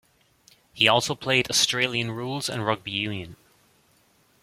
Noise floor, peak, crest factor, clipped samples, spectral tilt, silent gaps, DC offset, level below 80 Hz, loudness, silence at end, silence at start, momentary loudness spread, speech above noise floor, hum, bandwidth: -62 dBFS; -2 dBFS; 26 dB; under 0.1%; -2.5 dB/octave; none; under 0.1%; -62 dBFS; -23 LUFS; 1.1 s; 0.75 s; 10 LU; 38 dB; none; 16.5 kHz